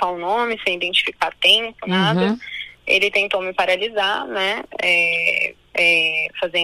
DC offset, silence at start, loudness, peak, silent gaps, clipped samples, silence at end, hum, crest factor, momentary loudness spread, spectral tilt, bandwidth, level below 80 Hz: under 0.1%; 0 s; -18 LUFS; -2 dBFS; none; under 0.1%; 0 s; none; 18 dB; 8 LU; -4 dB/octave; 15.5 kHz; -58 dBFS